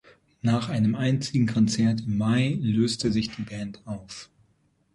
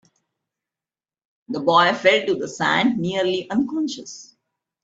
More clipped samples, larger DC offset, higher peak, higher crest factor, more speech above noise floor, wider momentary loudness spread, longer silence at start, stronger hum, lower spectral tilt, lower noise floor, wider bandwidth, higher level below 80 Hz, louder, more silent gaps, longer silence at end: neither; neither; second, -10 dBFS vs -2 dBFS; about the same, 16 dB vs 20 dB; second, 42 dB vs over 70 dB; about the same, 14 LU vs 15 LU; second, 0.45 s vs 1.5 s; neither; first, -6 dB/octave vs -4.5 dB/octave; second, -66 dBFS vs under -90 dBFS; first, 11.5 kHz vs 8 kHz; first, -54 dBFS vs -66 dBFS; second, -25 LUFS vs -20 LUFS; neither; about the same, 0.7 s vs 0.6 s